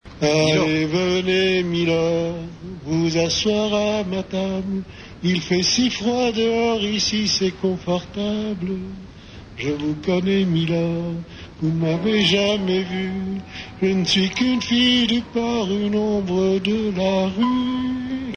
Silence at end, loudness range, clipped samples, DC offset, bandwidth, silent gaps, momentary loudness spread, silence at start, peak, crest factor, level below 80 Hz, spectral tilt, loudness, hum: 0 s; 4 LU; under 0.1%; under 0.1%; 9.6 kHz; none; 11 LU; 0.05 s; -6 dBFS; 14 dB; -46 dBFS; -5 dB/octave; -20 LUFS; none